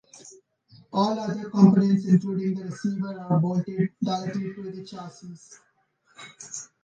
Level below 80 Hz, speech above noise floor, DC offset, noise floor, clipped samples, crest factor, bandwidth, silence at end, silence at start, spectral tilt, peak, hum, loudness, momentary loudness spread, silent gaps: -70 dBFS; 41 dB; under 0.1%; -66 dBFS; under 0.1%; 22 dB; 8.8 kHz; 0.2 s; 0.15 s; -7.5 dB/octave; -4 dBFS; none; -24 LUFS; 22 LU; none